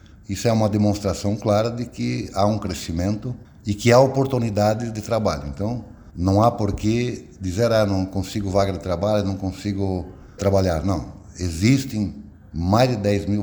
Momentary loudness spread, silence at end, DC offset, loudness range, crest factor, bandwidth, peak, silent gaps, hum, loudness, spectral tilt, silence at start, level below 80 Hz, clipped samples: 11 LU; 0 s; under 0.1%; 3 LU; 18 dB; over 20 kHz; -2 dBFS; none; none; -22 LUFS; -6.5 dB/octave; 0.3 s; -42 dBFS; under 0.1%